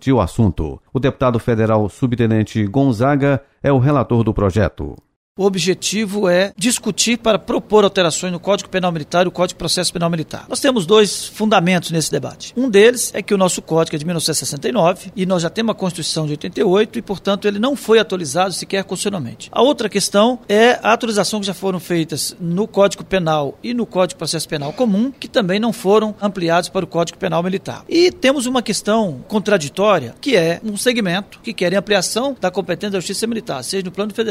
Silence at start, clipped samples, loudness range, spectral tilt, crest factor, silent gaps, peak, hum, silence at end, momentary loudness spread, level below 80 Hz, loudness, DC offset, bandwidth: 0 s; under 0.1%; 2 LU; -4.5 dB/octave; 16 dB; 5.16-5.35 s; -2 dBFS; none; 0 s; 7 LU; -42 dBFS; -17 LUFS; under 0.1%; 16 kHz